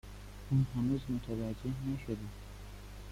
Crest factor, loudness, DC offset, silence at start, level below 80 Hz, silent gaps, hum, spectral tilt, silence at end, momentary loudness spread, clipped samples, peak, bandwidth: 16 dB; -36 LUFS; under 0.1%; 0.05 s; -50 dBFS; none; 50 Hz at -50 dBFS; -8 dB/octave; 0 s; 17 LU; under 0.1%; -20 dBFS; 15.5 kHz